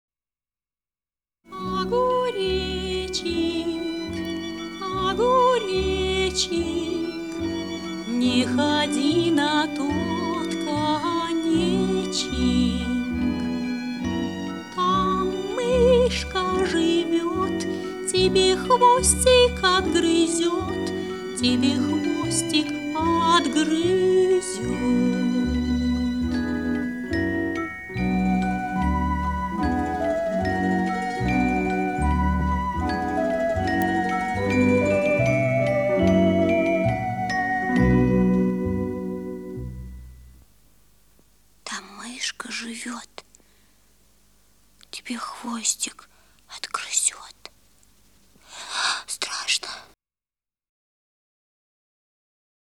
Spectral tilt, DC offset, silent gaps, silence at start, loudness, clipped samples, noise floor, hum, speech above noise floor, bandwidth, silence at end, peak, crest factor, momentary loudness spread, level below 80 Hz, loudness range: -4.5 dB/octave; 0.1%; none; 1.5 s; -23 LUFS; under 0.1%; under -90 dBFS; none; over 70 dB; 17.5 kHz; 2.8 s; -4 dBFS; 18 dB; 12 LU; -38 dBFS; 12 LU